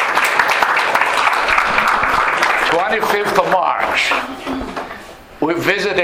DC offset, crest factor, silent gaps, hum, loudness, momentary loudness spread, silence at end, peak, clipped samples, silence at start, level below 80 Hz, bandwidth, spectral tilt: under 0.1%; 16 dB; none; none; -15 LUFS; 11 LU; 0 s; 0 dBFS; under 0.1%; 0 s; -44 dBFS; 19.5 kHz; -3 dB/octave